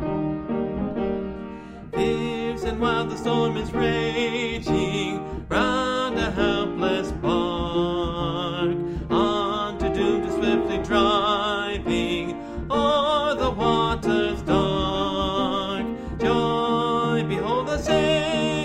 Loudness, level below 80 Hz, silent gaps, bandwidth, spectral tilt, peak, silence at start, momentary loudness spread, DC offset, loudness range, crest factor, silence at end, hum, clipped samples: -24 LUFS; -40 dBFS; none; 12.5 kHz; -5.5 dB/octave; -8 dBFS; 0 s; 6 LU; under 0.1%; 2 LU; 16 dB; 0 s; none; under 0.1%